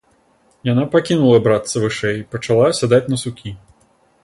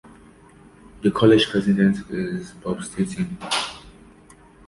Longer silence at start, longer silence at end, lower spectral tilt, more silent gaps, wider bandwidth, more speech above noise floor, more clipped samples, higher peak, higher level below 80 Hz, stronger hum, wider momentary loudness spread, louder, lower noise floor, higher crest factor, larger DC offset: second, 0.65 s vs 1 s; second, 0.65 s vs 0.8 s; about the same, -6 dB/octave vs -5.5 dB/octave; neither; about the same, 11.5 kHz vs 11.5 kHz; first, 41 dB vs 29 dB; neither; about the same, -2 dBFS vs -2 dBFS; about the same, -50 dBFS vs -50 dBFS; neither; about the same, 13 LU vs 14 LU; first, -16 LUFS vs -22 LUFS; first, -57 dBFS vs -49 dBFS; about the same, 16 dB vs 20 dB; neither